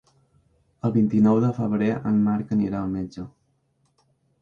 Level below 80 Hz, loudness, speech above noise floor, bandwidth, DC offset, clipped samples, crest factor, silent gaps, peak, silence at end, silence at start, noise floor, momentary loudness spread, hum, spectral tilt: -54 dBFS; -23 LUFS; 46 dB; 6.8 kHz; under 0.1%; under 0.1%; 14 dB; none; -10 dBFS; 1.1 s; 0.85 s; -68 dBFS; 13 LU; none; -10 dB/octave